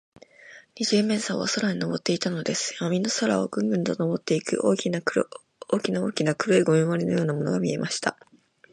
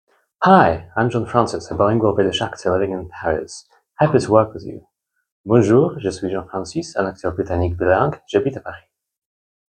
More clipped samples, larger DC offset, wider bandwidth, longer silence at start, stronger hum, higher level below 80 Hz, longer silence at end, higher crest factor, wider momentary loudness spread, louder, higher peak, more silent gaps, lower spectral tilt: neither; neither; first, 11.5 kHz vs 9.8 kHz; about the same, 0.45 s vs 0.4 s; neither; second, -68 dBFS vs -48 dBFS; second, 0.6 s vs 1 s; about the same, 20 dB vs 20 dB; second, 6 LU vs 12 LU; second, -25 LUFS vs -18 LUFS; second, -6 dBFS vs 0 dBFS; second, none vs 5.32-5.44 s; second, -5 dB/octave vs -6.5 dB/octave